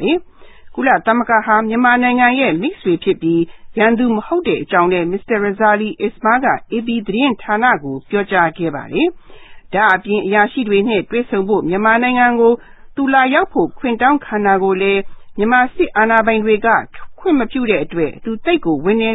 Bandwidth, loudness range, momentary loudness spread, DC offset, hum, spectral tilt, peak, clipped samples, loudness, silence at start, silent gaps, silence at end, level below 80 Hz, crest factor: 4 kHz; 2 LU; 8 LU; under 0.1%; none; -8.5 dB/octave; 0 dBFS; under 0.1%; -15 LUFS; 0 s; none; 0 s; -46 dBFS; 14 dB